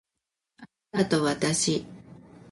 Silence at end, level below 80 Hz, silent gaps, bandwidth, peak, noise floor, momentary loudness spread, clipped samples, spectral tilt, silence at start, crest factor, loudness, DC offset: 0.35 s; -62 dBFS; none; 11.5 kHz; -10 dBFS; -86 dBFS; 9 LU; under 0.1%; -4 dB/octave; 0.6 s; 20 dB; -26 LUFS; under 0.1%